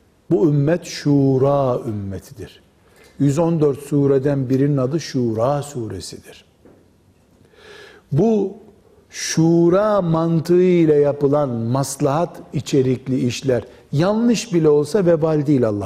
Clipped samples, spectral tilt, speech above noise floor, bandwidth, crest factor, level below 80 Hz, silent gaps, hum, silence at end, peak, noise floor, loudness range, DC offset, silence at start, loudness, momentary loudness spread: under 0.1%; -7 dB/octave; 37 dB; 15 kHz; 12 dB; -52 dBFS; none; none; 0 s; -6 dBFS; -54 dBFS; 8 LU; under 0.1%; 0.3 s; -18 LUFS; 12 LU